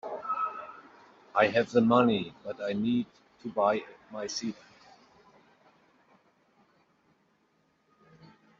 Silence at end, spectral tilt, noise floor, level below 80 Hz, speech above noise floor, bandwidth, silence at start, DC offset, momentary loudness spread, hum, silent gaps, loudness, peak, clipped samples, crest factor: 4.05 s; -4 dB/octave; -71 dBFS; -72 dBFS; 43 dB; 7.6 kHz; 0.05 s; under 0.1%; 20 LU; none; none; -29 LUFS; -10 dBFS; under 0.1%; 22 dB